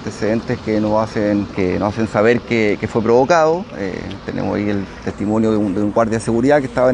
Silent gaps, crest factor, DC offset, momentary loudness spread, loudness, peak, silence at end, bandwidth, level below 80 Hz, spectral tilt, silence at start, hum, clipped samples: none; 16 dB; under 0.1%; 9 LU; -17 LUFS; 0 dBFS; 0 s; 10.5 kHz; -42 dBFS; -6.5 dB/octave; 0 s; none; under 0.1%